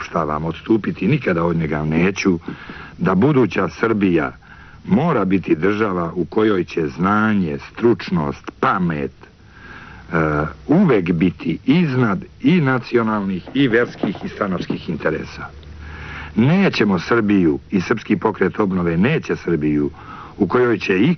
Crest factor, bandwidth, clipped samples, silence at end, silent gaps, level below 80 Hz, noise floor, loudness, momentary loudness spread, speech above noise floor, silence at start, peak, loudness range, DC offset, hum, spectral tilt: 14 dB; 6.4 kHz; under 0.1%; 0 s; none; -44 dBFS; -40 dBFS; -18 LUFS; 11 LU; 22 dB; 0 s; -4 dBFS; 3 LU; under 0.1%; none; -6 dB/octave